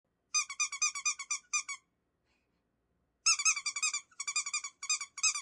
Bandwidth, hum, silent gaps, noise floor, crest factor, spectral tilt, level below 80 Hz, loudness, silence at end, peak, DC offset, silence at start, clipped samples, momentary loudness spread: 12 kHz; none; none; -79 dBFS; 20 dB; 6 dB/octave; -78 dBFS; -32 LUFS; 0 s; -16 dBFS; under 0.1%; 0.35 s; under 0.1%; 9 LU